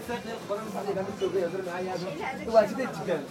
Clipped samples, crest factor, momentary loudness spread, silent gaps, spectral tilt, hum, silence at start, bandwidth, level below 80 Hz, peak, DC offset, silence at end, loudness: under 0.1%; 22 dB; 10 LU; none; -5.5 dB/octave; none; 0 s; 16.5 kHz; -64 dBFS; -8 dBFS; under 0.1%; 0 s; -30 LUFS